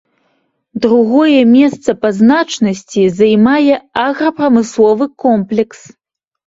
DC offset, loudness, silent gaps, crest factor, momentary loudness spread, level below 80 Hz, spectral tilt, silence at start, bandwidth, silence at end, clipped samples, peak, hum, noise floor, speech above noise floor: under 0.1%; -11 LUFS; none; 12 dB; 8 LU; -52 dBFS; -6 dB/octave; 0.75 s; 7.8 kHz; 0.85 s; under 0.1%; 0 dBFS; none; -62 dBFS; 51 dB